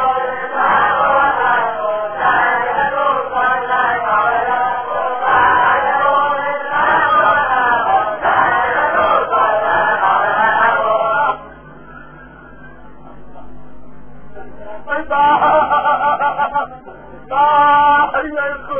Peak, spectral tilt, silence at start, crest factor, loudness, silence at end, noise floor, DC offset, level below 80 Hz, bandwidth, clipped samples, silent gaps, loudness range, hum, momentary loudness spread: -2 dBFS; -7 dB/octave; 0 s; 14 dB; -14 LUFS; 0 s; -39 dBFS; under 0.1%; -46 dBFS; 3.5 kHz; under 0.1%; none; 5 LU; none; 8 LU